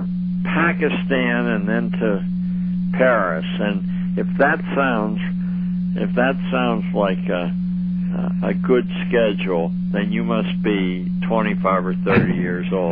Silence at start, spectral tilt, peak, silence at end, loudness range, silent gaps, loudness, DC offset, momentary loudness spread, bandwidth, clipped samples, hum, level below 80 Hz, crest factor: 0 s; -11 dB/octave; -4 dBFS; 0 s; 1 LU; none; -20 LUFS; under 0.1%; 5 LU; 4.3 kHz; under 0.1%; 60 Hz at -25 dBFS; -44 dBFS; 16 dB